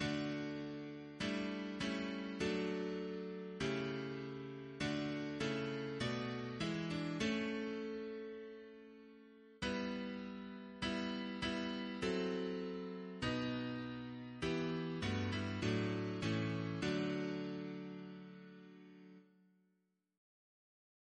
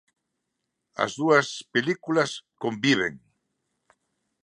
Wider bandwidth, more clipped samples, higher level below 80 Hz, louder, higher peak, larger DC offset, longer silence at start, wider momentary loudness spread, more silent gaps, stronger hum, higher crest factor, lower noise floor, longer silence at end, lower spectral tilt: second, 10 kHz vs 11.5 kHz; neither; about the same, -66 dBFS vs -70 dBFS; second, -42 LUFS vs -25 LUFS; second, -26 dBFS vs -4 dBFS; neither; second, 0 s vs 1 s; first, 14 LU vs 10 LU; neither; neither; second, 16 dB vs 22 dB; about the same, -82 dBFS vs -81 dBFS; first, 1.95 s vs 1.3 s; first, -6 dB/octave vs -4.5 dB/octave